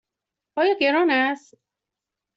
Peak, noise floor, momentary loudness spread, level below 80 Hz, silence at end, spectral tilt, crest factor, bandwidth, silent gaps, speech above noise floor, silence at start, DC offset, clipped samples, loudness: -8 dBFS; -86 dBFS; 14 LU; -72 dBFS; 1 s; -3.5 dB/octave; 16 dB; 7.8 kHz; none; 65 dB; 0.55 s; under 0.1%; under 0.1%; -20 LUFS